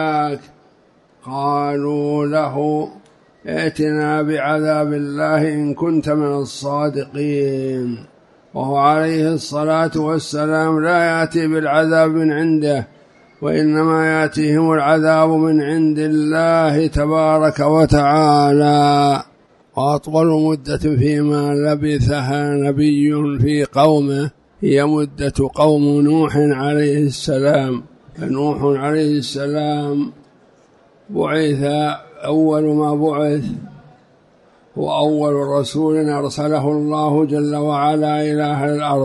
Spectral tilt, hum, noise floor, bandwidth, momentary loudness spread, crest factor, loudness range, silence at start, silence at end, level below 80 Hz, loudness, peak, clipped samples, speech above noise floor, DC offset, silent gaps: -7 dB/octave; none; -53 dBFS; 11.5 kHz; 9 LU; 16 dB; 5 LU; 0 s; 0 s; -42 dBFS; -16 LUFS; 0 dBFS; under 0.1%; 37 dB; under 0.1%; none